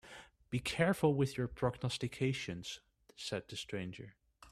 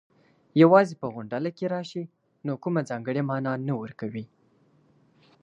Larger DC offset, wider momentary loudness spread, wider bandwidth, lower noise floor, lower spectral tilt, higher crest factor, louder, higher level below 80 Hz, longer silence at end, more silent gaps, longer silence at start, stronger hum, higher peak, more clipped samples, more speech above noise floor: neither; about the same, 18 LU vs 19 LU; first, 14.5 kHz vs 8.8 kHz; second, -57 dBFS vs -63 dBFS; second, -5.5 dB/octave vs -8 dB/octave; about the same, 22 dB vs 22 dB; second, -37 LUFS vs -26 LUFS; first, -62 dBFS vs -72 dBFS; second, 0 s vs 1.2 s; neither; second, 0.05 s vs 0.55 s; neither; second, -16 dBFS vs -4 dBFS; neither; second, 20 dB vs 38 dB